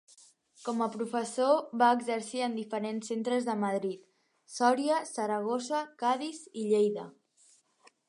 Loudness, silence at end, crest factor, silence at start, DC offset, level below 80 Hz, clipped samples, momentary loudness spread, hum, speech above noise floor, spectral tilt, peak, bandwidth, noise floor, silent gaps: -31 LUFS; 1 s; 20 dB; 0.6 s; under 0.1%; -86 dBFS; under 0.1%; 12 LU; none; 35 dB; -4.5 dB/octave; -12 dBFS; 11.5 kHz; -65 dBFS; none